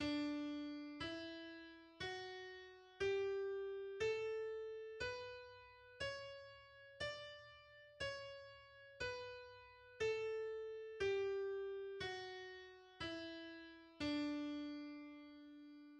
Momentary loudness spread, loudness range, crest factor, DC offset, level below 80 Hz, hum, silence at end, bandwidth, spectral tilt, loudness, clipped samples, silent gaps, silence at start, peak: 18 LU; 6 LU; 16 dB; under 0.1%; -72 dBFS; none; 0 s; 10 kHz; -4.5 dB/octave; -47 LUFS; under 0.1%; none; 0 s; -30 dBFS